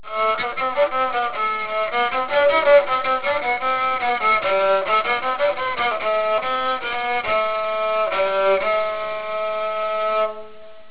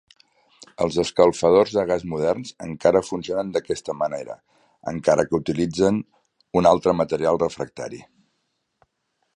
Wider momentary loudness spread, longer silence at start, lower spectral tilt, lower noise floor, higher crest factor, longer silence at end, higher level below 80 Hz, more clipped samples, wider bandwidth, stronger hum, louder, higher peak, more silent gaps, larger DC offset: second, 6 LU vs 16 LU; second, 0.05 s vs 0.6 s; about the same, -6 dB/octave vs -6 dB/octave; second, -42 dBFS vs -74 dBFS; about the same, 16 dB vs 20 dB; second, 0.1 s vs 1.35 s; about the same, -56 dBFS vs -52 dBFS; neither; second, 4 kHz vs 11 kHz; neither; about the same, -20 LUFS vs -22 LUFS; about the same, -4 dBFS vs -2 dBFS; neither; first, 1% vs under 0.1%